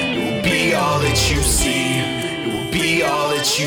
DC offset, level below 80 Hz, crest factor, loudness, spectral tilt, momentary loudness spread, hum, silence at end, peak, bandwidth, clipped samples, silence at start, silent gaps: under 0.1%; -30 dBFS; 14 dB; -17 LUFS; -3.5 dB/octave; 6 LU; none; 0 s; -4 dBFS; over 20 kHz; under 0.1%; 0 s; none